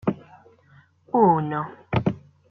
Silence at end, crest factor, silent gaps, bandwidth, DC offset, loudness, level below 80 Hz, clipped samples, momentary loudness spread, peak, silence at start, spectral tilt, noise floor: 0.3 s; 20 dB; none; 6.2 kHz; under 0.1%; -23 LUFS; -56 dBFS; under 0.1%; 16 LU; -6 dBFS; 0.05 s; -10 dB/octave; -56 dBFS